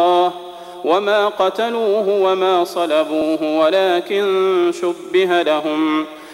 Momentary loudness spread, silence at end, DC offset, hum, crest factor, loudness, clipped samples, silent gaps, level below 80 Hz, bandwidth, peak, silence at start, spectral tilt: 4 LU; 0 s; under 0.1%; none; 12 dB; -17 LUFS; under 0.1%; none; -64 dBFS; 15.5 kHz; -4 dBFS; 0 s; -4.5 dB/octave